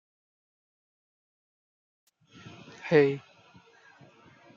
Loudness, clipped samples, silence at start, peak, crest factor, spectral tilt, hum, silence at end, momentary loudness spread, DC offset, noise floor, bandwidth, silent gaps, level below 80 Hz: -25 LUFS; under 0.1%; 2.85 s; -10 dBFS; 24 dB; -7.5 dB/octave; none; 1.4 s; 26 LU; under 0.1%; -58 dBFS; 7.2 kHz; none; -78 dBFS